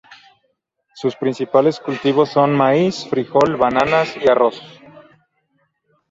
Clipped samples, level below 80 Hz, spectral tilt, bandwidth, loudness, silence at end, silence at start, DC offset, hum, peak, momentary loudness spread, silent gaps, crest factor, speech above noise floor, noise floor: under 0.1%; -56 dBFS; -6.5 dB/octave; 7.8 kHz; -17 LUFS; 1.45 s; 0.1 s; under 0.1%; none; -2 dBFS; 8 LU; none; 16 dB; 52 dB; -68 dBFS